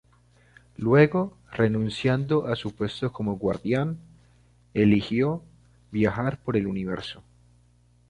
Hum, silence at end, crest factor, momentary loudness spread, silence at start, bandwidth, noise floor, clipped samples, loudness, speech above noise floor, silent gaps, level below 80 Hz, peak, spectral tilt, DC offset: 60 Hz at -50 dBFS; 0.9 s; 22 dB; 12 LU; 0.8 s; 10.5 kHz; -60 dBFS; under 0.1%; -25 LUFS; 36 dB; none; -52 dBFS; -4 dBFS; -8 dB/octave; under 0.1%